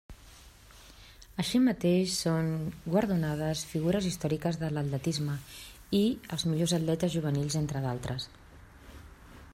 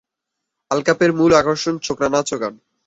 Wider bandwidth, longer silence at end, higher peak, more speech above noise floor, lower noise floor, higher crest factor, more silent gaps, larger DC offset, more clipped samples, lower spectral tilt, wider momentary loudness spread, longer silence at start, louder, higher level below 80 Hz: first, 16 kHz vs 8 kHz; second, 0 s vs 0.3 s; second, -14 dBFS vs -2 dBFS; second, 24 dB vs 63 dB; second, -53 dBFS vs -80 dBFS; about the same, 16 dB vs 18 dB; neither; neither; neither; about the same, -5.5 dB/octave vs -4.5 dB/octave; about the same, 11 LU vs 10 LU; second, 0.1 s vs 0.7 s; second, -30 LUFS vs -18 LUFS; about the same, -54 dBFS vs -52 dBFS